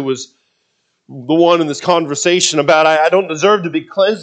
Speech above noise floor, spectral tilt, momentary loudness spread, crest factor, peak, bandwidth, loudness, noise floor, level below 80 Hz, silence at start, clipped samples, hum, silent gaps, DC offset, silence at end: 52 dB; -3.5 dB/octave; 10 LU; 14 dB; 0 dBFS; 9.4 kHz; -13 LUFS; -65 dBFS; -66 dBFS; 0 s; under 0.1%; none; none; under 0.1%; 0 s